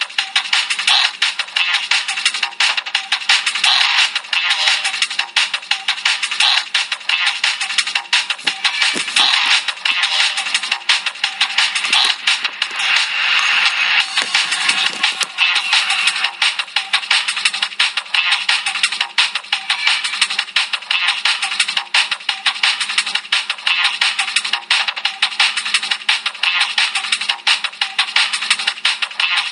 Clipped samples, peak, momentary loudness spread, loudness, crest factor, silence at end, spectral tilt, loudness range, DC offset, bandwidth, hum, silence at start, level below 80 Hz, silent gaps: under 0.1%; 0 dBFS; 5 LU; -15 LUFS; 18 dB; 0 s; 3.5 dB/octave; 2 LU; under 0.1%; 13 kHz; none; 0 s; -78 dBFS; none